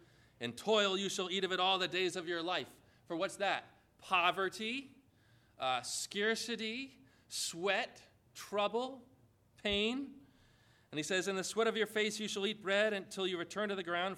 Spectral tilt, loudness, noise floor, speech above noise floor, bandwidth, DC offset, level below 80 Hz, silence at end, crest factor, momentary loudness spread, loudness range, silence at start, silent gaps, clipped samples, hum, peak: -2.5 dB/octave; -36 LUFS; -68 dBFS; 31 dB; 16 kHz; under 0.1%; -72 dBFS; 0 s; 22 dB; 12 LU; 4 LU; 0.4 s; none; under 0.1%; none; -16 dBFS